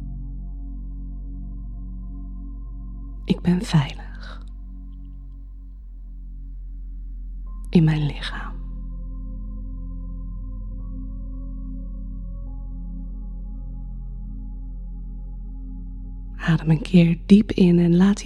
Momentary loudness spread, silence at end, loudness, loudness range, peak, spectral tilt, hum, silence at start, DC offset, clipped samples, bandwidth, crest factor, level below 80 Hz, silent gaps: 22 LU; 0 s; -22 LUFS; 15 LU; -2 dBFS; -7.5 dB/octave; none; 0 s; under 0.1%; under 0.1%; 9.8 kHz; 24 dB; -32 dBFS; none